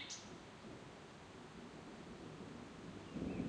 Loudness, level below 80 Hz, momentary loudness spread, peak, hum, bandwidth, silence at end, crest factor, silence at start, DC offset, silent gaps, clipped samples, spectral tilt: -53 LUFS; -66 dBFS; 8 LU; -30 dBFS; none; 10.5 kHz; 0 s; 20 dB; 0 s; under 0.1%; none; under 0.1%; -4.5 dB/octave